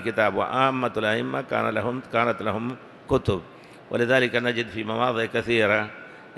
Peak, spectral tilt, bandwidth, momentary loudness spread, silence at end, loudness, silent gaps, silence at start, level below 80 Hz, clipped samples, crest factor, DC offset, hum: -4 dBFS; -6 dB/octave; 12.5 kHz; 10 LU; 0 s; -24 LUFS; none; 0 s; -52 dBFS; under 0.1%; 20 dB; under 0.1%; none